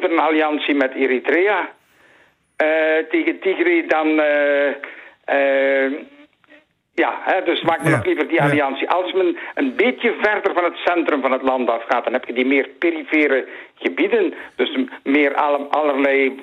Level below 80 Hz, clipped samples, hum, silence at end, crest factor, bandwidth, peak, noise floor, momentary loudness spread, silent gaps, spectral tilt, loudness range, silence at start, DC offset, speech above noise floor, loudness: -66 dBFS; under 0.1%; none; 0 s; 14 dB; 12 kHz; -4 dBFS; -55 dBFS; 6 LU; none; -6.5 dB/octave; 2 LU; 0 s; under 0.1%; 37 dB; -18 LUFS